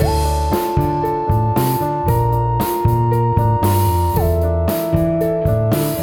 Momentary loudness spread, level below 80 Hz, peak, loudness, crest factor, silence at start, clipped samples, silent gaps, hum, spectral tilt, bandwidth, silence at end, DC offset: 2 LU; -26 dBFS; -2 dBFS; -17 LUFS; 14 dB; 0 s; under 0.1%; none; none; -7 dB/octave; over 20 kHz; 0 s; under 0.1%